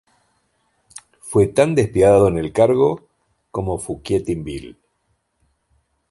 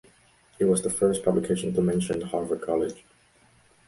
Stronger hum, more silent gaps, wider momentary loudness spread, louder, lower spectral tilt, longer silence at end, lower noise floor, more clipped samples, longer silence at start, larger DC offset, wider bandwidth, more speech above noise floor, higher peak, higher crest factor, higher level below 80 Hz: neither; neither; first, 17 LU vs 6 LU; first, -18 LUFS vs -26 LUFS; about the same, -6.5 dB/octave vs -6 dB/octave; first, 1.4 s vs 0.9 s; first, -68 dBFS vs -60 dBFS; neither; first, 1.25 s vs 0.6 s; neither; about the same, 11.5 kHz vs 11.5 kHz; first, 52 dB vs 35 dB; first, -2 dBFS vs -8 dBFS; about the same, 18 dB vs 18 dB; first, -42 dBFS vs -56 dBFS